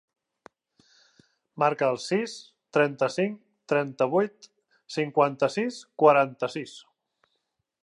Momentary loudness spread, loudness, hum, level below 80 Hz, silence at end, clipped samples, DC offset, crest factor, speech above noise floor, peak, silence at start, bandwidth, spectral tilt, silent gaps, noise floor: 14 LU; -26 LUFS; none; -80 dBFS; 1.05 s; under 0.1%; under 0.1%; 22 dB; 53 dB; -4 dBFS; 1.55 s; 11 kHz; -5.5 dB/octave; none; -79 dBFS